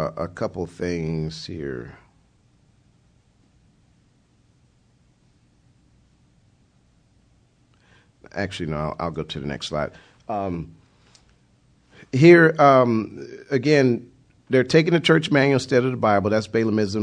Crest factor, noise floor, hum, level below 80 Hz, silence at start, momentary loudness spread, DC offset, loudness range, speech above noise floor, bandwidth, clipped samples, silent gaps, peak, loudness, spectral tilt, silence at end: 22 dB; -60 dBFS; none; -52 dBFS; 0 s; 18 LU; under 0.1%; 17 LU; 40 dB; 10 kHz; under 0.1%; none; -2 dBFS; -20 LUFS; -6.5 dB/octave; 0 s